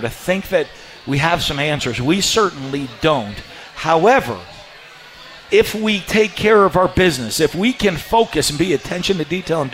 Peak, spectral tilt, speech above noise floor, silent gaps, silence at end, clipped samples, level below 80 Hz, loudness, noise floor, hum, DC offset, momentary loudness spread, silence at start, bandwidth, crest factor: -2 dBFS; -4 dB/octave; 23 dB; none; 0 s; under 0.1%; -40 dBFS; -17 LUFS; -40 dBFS; none; under 0.1%; 17 LU; 0 s; 16 kHz; 14 dB